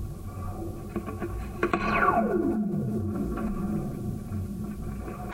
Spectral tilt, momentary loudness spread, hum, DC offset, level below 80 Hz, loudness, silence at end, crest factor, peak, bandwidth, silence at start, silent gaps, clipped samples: -7.5 dB/octave; 13 LU; none; under 0.1%; -40 dBFS; -30 LUFS; 0 s; 20 dB; -10 dBFS; 16 kHz; 0 s; none; under 0.1%